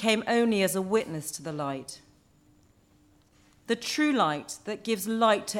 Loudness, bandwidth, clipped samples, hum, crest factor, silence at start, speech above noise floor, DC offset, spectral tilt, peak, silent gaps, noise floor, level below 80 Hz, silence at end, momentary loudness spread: -28 LUFS; 17.5 kHz; under 0.1%; none; 18 dB; 0 s; 34 dB; under 0.1%; -4 dB/octave; -10 dBFS; none; -62 dBFS; -68 dBFS; 0 s; 11 LU